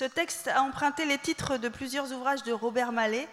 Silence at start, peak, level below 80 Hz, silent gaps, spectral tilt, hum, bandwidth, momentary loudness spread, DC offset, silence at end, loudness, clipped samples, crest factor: 0 s; -12 dBFS; -60 dBFS; none; -3 dB/octave; none; 16 kHz; 5 LU; under 0.1%; 0 s; -29 LUFS; under 0.1%; 16 dB